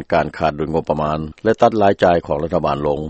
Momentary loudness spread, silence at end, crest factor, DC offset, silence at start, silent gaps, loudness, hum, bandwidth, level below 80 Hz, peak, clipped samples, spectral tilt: 7 LU; 0 s; 18 dB; under 0.1%; 0 s; none; -17 LUFS; none; 8.4 kHz; -40 dBFS; 0 dBFS; under 0.1%; -7.5 dB/octave